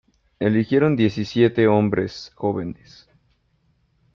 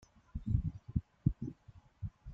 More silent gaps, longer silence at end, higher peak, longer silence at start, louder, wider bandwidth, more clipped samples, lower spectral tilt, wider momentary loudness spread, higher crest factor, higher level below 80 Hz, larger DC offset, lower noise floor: neither; first, 1.4 s vs 0 s; first, -4 dBFS vs -16 dBFS; about the same, 0.4 s vs 0.35 s; first, -20 LUFS vs -40 LUFS; about the same, 7.2 kHz vs 6.6 kHz; neither; second, -8 dB/octave vs -10.5 dB/octave; about the same, 12 LU vs 12 LU; about the same, 18 dB vs 22 dB; second, -56 dBFS vs -46 dBFS; neither; first, -65 dBFS vs -61 dBFS